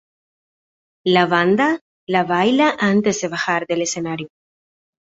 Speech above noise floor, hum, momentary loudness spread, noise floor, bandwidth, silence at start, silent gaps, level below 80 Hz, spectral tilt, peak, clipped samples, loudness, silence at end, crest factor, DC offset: over 73 dB; none; 11 LU; under -90 dBFS; 8 kHz; 1.05 s; 1.81-2.07 s; -62 dBFS; -4.5 dB/octave; -2 dBFS; under 0.1%; -18 LUFS; 0.85 s; 18 dB; under 0.1%